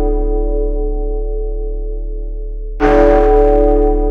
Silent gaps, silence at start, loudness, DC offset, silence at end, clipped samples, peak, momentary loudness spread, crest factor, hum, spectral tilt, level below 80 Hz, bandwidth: none; 0 s; -14 LUFS; under 0.1%; 0 s; under 0.1%; 0 dBFS; 17 LU; 12 dB; none; -9 dB/octave; -16 dBFS; 4.4 kHz